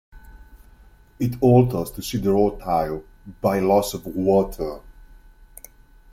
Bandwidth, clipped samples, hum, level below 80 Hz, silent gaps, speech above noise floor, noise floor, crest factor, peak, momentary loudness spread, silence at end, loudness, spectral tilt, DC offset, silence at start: 16.5 kHz; under 0.1%; none; -42 dBFS; none; 30 dB; -50 dBFS; 18 dB; -4 dBFS; 13 LU; 1.2 s; -21 LUFS; -7 dB/octave; under 0.1%; 0.15 s